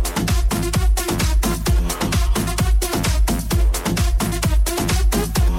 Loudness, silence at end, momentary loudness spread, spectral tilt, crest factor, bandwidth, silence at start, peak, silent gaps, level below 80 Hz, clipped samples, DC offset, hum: -20 LUFS; 0 s; 1 LU; -4.5 dB/octave; 10 dB; 16.5 kHz; 0 s; -8 dBFS; none; -20 dBFS; under 0.1%; 0.2%; none